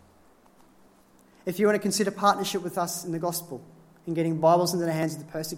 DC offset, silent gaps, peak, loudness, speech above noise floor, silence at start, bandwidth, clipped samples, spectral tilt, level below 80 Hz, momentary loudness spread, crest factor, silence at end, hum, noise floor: under 0.1%; none; -8 dBFS; -26 LUFS; 32 dB; 1.45 s; 16.5 kHz; under 0.1%; -4.5 dB/octave; -68 dBFS; 13 LU; 20 dB; 0 s; none; -58 dBFS